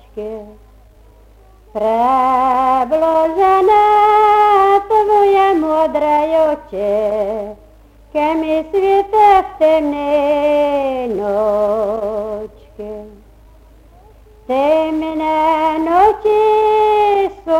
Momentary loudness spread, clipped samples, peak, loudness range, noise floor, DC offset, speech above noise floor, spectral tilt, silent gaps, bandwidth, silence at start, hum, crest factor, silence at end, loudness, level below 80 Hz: 14 LU; under 0.1%; 0 dBFS; 9 LU; -44 dBFS; under 0.1%; 30 dB; -5.5 dB/octave; none; 15.5 kHz; 0.15 s; none; 14 dB; 0 s; -14 LUFS; -44 dBFS